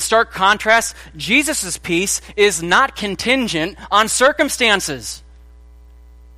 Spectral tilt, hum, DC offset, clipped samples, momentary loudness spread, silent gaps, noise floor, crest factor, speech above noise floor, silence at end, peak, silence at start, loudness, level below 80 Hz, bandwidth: -2 dB/octave; none; under 0.1%; under 0.1%; 10 LU; none; -42 dBFS; 18 dB; 25 dB; 1.2 s; 0 dBFS; 0 s; -16 LUFS; -42 dBFS; 15.5 kHz